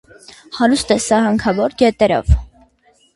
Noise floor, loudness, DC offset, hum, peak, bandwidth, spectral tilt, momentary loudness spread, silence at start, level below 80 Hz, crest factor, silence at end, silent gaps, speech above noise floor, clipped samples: -55 dBFS; -15 LUFS; under 0.1%; none; 0 dBFS; 11.5 kHz; -5.5 dB/octave; 4 LU; 0.5 s; -26 dBFS; 16 dB; 0.7 s; none; 41 dB; under 0.1%